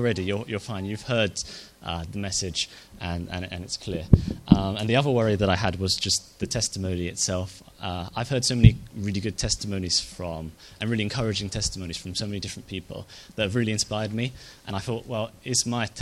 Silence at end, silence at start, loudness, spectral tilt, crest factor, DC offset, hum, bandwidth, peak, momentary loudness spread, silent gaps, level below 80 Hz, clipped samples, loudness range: 0 s; 0 s; -26 LUFS; -4.5 dB/octave; 26 dB; under 0.1%; none; 13.5 kHz; 0 dBFS; 13 LU; none; -40 dBFS; under 0.1%; 6 LU